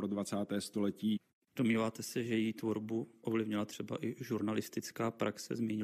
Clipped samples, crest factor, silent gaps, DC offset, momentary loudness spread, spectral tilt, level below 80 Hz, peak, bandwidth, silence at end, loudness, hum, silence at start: under 0.1%; 16 dB; 1.33-1.42 s; under 0.1%; 6 LU; -5.5 dB/octave; -82 dBFS; -22 dBFS; 15 kHz; 0 s; -37 LUFS; none; 0 s